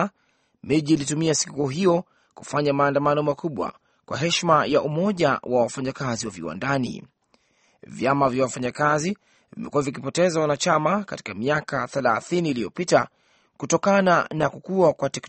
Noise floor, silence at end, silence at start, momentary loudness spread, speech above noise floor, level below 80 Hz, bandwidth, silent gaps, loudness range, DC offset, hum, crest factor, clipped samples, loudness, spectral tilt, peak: -67 dBFS; 0 s; 0 s; 10 LU; 44 dB; -60 dBFS; 8.8 kHz; none; 3 LU; under 0.1%; none; 20 dB; under 0.1%; -23 LUFS; -5 dB/octave; -4 dBFS